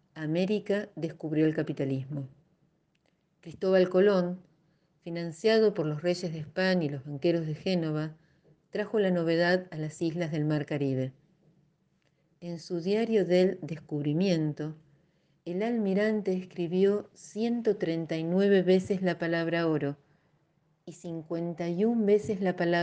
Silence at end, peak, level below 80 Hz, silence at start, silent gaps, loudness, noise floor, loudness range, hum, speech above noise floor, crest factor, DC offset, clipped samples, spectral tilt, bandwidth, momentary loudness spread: 0 s; -12 dBFS; -72 dBFS; 0.15 s; none; -29 LUFS; -72 dBFS; 4 LU; none; 44 dB; 18 dB; under 0.1%; under 0.1%; -7 dB/octave; 9.2 kHz; 14 LU